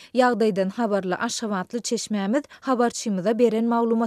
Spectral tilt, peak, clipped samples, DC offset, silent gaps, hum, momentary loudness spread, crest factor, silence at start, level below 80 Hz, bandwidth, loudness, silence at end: -5 dB/octave; -6 dBFS; under 0.1%; under 0.1%; none; none; 7 LU; 16 dB; 0 s; -70 dBFS; 13.5 kHz; -23 LUFS; 0 s